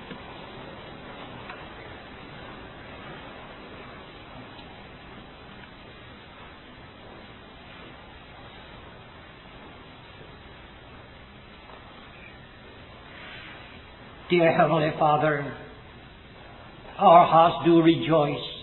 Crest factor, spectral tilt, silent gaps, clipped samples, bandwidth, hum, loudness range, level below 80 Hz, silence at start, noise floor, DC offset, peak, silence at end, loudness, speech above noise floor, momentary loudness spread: 24 dB; -10 dB/octave; none; under 0.1%; 4.2 kHz; none; 24 LU; -54 dBFS; 0 s; -47 dBFS; under 0.1%; -4 dBFS; 0 s; -20 LUFS; 27 dB; 26 LU